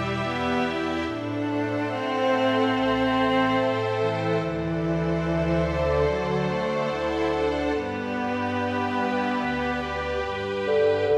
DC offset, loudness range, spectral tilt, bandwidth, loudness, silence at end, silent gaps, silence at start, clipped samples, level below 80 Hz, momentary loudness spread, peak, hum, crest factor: under 0.1%; 2 LU; -6.5 dB/octave; 11 kHz; -25 LUFS; 0 s; none; 0 s; under 0.1%; -42 dBFS; 6 LU; -10 dBFS; none; 14 dB